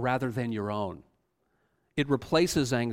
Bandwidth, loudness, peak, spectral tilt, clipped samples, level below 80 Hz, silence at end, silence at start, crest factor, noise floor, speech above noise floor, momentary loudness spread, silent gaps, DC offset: 16 kHz; -29 LUFS; -12 dBFS; -5.5 dB/octave; under 0.1%; -56 dBFS; 0 s; 0 s; 18 dB; -74 dBFS; 46 dB; 11 LU; none; under 0.1%